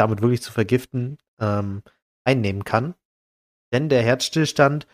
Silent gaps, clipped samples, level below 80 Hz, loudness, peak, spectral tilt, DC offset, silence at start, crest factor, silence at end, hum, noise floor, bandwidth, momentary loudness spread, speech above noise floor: 1.28-1.37 s, 2.02-2.25 s, 3.05-3.72 s; under 0.1%; -56 dBFS; -22 LUFS; -2 dBFS; -6 dB/octave; under 0.1%; 0 s; 20 dB; 0.1 s; none; under -90 dBFS; 15.5 kHz; 11 LU; over 69 dB